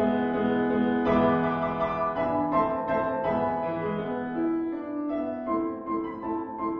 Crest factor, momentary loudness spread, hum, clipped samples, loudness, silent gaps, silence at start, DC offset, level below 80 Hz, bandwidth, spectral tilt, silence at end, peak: 14 dB; 7 LU; none; under 0.1%; -27 LUFS; none; 0 s; under 0.1%; -54 dBFS; 5.8 kHz; -9.5 dB/octave; 0 s; -12 dBFS